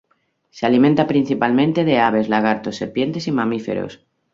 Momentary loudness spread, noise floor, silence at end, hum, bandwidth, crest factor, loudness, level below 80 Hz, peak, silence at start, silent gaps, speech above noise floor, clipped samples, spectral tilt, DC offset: 9 LU; -65 dBFS; 0.4 s; none; 7.6 kHz; 16 dB; -18 LUFS; -58 dBFS; -2 dBFS; 0.55 s; none; 48 dB; under 0.1%; -7 dB/octave; under 0.1%